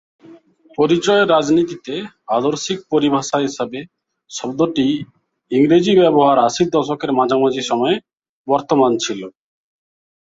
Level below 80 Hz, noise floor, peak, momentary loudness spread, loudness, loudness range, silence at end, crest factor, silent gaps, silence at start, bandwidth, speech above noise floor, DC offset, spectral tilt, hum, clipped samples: -58 dBFS; -45 dBFS; -2 dBFS; 15 LU; -17 LUFS; 5 LU; 0.95 s; 16 dB; 8.29-8.45 s; 0.3 s; 8 kHz; 29 dB; under 0.1%; -5 dB/octave; none; under 0.1%